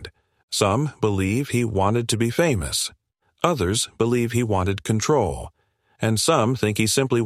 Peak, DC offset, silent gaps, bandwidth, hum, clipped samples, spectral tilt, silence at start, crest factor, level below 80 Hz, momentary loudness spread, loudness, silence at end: -2 dBFS; under 0.1%; 0.43-0.48 s; 15.5 kHz; none; under 0.1%; -4.5 dB/octave; 0 s; 20 dB; -46 dBFS; 7 LU; -22 LUFS; 0 s